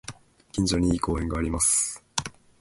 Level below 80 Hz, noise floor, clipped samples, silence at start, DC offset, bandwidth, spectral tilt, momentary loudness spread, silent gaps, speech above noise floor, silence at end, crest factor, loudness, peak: -38 dBFS; -45 dBFS; under 0.1%; 0.1 s; under 0.1%; 12 kHz; -4 dB/octave; 13 LU; none; 20 dB; 0.3 s; 26 dB; -25 LUFS; -2 dBFS